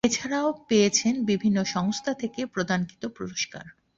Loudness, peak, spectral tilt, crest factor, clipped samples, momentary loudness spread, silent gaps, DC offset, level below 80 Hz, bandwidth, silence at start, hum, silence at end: -26 LUFS; -8 dBFS; -4 dB/octave; 18 dB; under 0.1%; 11 LU; none; under 0.1%; -62 dBFS; 7.8 kHz; 0.05 s; none; 0.25 s